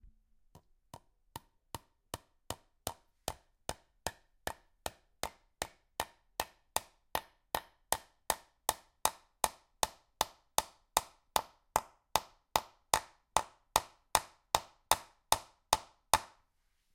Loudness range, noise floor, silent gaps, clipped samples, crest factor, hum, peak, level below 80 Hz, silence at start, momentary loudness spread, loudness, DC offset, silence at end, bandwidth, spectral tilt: 12 LU; -76 dBFS; none; under 0.1%; 32 dB; none; -8 dBFS; -60 dBFS; 1.35 s; 14 LU; -37 LUFS; under 0.1%; 0.7 s; 17 kHz; -1 dB/octave